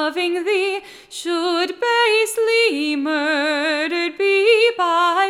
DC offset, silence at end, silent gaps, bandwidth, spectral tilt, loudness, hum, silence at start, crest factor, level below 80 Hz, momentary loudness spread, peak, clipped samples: under 0.1%; 0 s; none; 15.5 kHz; -0.5 dB/octave; -18 LUFS; none; 0 s; 14 dB; -68 dBFS; 8 LU; -4 dBFS; under 0.1%